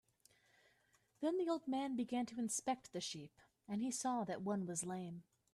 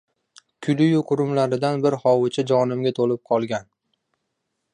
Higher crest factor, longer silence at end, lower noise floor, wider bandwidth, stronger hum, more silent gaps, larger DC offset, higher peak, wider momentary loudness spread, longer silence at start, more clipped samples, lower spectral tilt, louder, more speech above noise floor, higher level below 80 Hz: about the same, 16 dB vs 16 dB; second, 0.3 s vs 1.1 s; about the same, -77 dBFS vs -77 dBFS; first, 13.5 kHz vs 10.5 kHz; neither; neither; neither; second, -28 dBFS vs -6 dBFS; about the same, 8 LU vs 6 LU; first, 1.2 s vs 0.6 s; neither; second, -4.5 dB/octave vs -7 dB/octave; second, -42 LUFS vs -21 LUFS; second, 35 dB vs 57 dB; second, -82 dBFS vs -68 dBFS